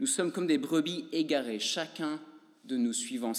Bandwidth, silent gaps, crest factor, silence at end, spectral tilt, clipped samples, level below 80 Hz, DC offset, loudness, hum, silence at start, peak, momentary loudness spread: 16 kHz; none; 16 dB; 0 s; -3 dB/octave; under 0.1%; under -90 dBFS; under 0.1%; -31 LUFS; none; 0 s; -16 dBFS; 8 LU